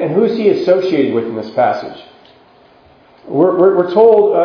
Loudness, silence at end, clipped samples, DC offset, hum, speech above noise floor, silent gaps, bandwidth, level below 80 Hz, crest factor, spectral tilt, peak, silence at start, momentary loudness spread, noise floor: -13 LUFS; 0 s; under 0.1%; under 0.1%; none; 34 dB; none; 5.4 kHz; -60 dBFS; 14 dB; -8 dB/octave; 0 dBFS; 0 s; 12 LU; -46 dBFS